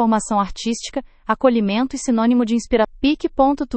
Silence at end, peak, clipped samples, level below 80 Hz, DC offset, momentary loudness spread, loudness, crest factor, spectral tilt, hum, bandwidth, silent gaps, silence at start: 0 s; 0 dBFS; under 0.1%; -40 dBFS; under 0.1%; 8 LU; -19 LUFS; 18 dB; -5 dB/octave; none; 8.8 kHz; none; 0 s